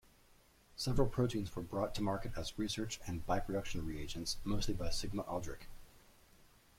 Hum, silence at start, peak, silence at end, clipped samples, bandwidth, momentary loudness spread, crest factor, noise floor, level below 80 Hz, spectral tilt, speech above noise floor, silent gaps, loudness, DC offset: none; 0.75 s; -18 dBFS; 0.8 s; under 0.1%; 16 kHz; 8 LU; 20 dB; -66 dBFS; -48 dBFS; -5 dB/octave; 29 dB; none; -40 LUFS; under 0.1%